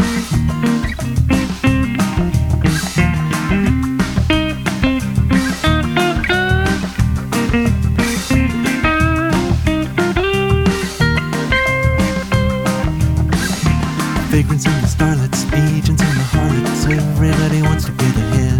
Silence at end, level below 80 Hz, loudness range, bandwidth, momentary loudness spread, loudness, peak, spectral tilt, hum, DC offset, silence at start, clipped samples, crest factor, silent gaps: 0 s; -26 dBFS; 1 LU; 18 kHz; 3 LU; -16 LUFS; 0 dBFS; -5.5 dB/octave; none; under 0.1%; 0 s; under 0.1%; 14 dB; none